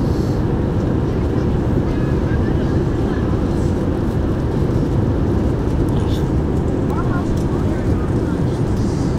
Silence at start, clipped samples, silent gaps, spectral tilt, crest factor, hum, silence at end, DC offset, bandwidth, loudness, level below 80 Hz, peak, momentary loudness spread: 0 s; under 0.1%; none; -8.5 dB/octave; 12 dB; none; 0 s; under 0.1%; 13 kHz; -19 LUFS; -24 dBFS; -4 dBFS; 1 LU